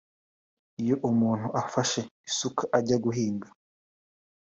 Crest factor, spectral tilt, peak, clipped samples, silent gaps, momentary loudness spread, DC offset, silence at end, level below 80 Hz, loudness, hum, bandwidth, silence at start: 20 dB; -5 dB/octave; -8 dBFS; under 0.1%; 2.11-2.24 s; 8 LU; under 0.1%; 1 s; -66 dBFS; -28 LUFS; none; 8 kHz; 0.8 s